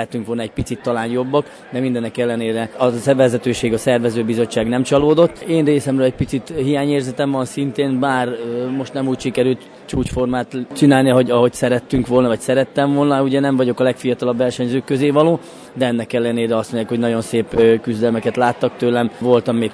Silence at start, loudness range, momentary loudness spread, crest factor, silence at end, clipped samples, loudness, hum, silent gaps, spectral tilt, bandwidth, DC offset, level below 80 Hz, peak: 0 s; 4 LU; 8 LU; 16 dB; 0 s; under 0.1%; -17 LUFS; none; none; -6.5 dB/octave; 11 kHz; under 0.1%; -44 dBFS; 0 dBFS